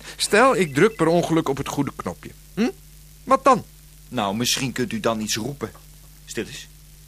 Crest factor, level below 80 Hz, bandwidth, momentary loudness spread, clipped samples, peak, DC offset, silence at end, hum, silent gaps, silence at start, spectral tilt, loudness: 20 dB; -48 dBFS; 15.5 kHz; 17 LU; under 0.1%; -4 dBFS; under 0.1%; 0.4 s; none; none; 0 s; -4 dB/octave; -21 LUFS